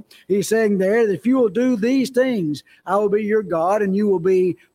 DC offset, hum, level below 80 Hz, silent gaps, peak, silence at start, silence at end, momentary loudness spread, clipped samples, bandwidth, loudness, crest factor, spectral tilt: under 0.1%; none; -64 dBFS; none; -6 dBFS; 0.3 s; 0.2 s; 5 LU; under 0.1%; 16 kHz; -19 LUFS; 12 dB; -6.5 dB/octave